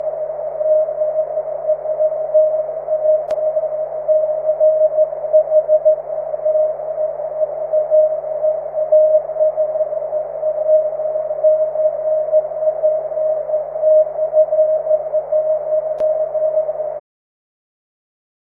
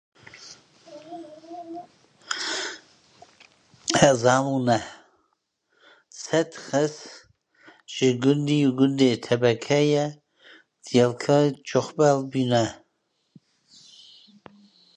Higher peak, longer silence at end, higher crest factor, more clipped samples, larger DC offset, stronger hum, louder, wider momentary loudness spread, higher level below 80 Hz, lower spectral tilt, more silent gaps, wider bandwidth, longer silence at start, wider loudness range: about the same, -4 dBFS vs -2 dBFS; second, 1.55 s vs 2.2 s; second, 14 dB vs 24 dB; neither; neither; neither; first, -17 LUFS vs -23 LUFS; second, 8 LU vs 21 LU; about the same, -58 dBFS vs -62 dBFS; first, -8 dB/octave vs -5 dB/octave; neither; second, 2.3 kHz vs 10.5 kHz; second, 0 s vs 0.35 s; second, 2 LU vs 8 LU